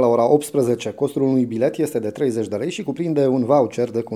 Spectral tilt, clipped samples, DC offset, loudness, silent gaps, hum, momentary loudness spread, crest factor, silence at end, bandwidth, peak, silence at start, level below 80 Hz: -6.5 dB/octave; under 0.1%; under 0.1%; -20 LUFS; none; none; 7 LU; 18 dB; 0 s; 15.5 kHz; -2 dBFS; 0 s; -68 dBFS